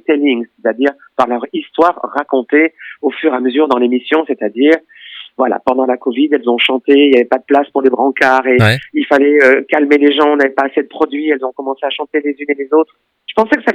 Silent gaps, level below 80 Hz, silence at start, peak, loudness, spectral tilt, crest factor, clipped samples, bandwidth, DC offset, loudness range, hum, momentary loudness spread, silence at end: none; -56 dBFS; 0.1 s; 0 dBFS; -13 LUFS; -6.5 dB/octave; 12 dB; 0.1%; 12.5 kHz; under 0.1%; 4 LU; none; 9 LU; 0 s